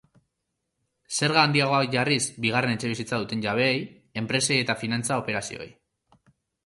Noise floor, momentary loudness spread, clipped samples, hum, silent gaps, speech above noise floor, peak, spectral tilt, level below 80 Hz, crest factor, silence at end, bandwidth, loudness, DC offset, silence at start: -80 dBFS; 11 LU; under 0.1%; none; none; 55 dB; -4 dBFS; -4 dB/octave; -62 dBFS; 22 dB; 0.95 s; 11.5 kHz; -24 LUFS; under 0.1%; 1.1 s